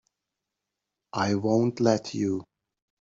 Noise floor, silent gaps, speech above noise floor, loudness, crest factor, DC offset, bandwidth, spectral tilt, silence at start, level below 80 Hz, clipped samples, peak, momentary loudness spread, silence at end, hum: -86 dBFS; none; 61 dB; -26 LUFS; 20 dB; under 0.1%; 7.8 kHz; -6 dB/octave; 1.15 s; -68 dBFS; under 0.1%; -8 dBFS; 9 LU; 0.6 s; none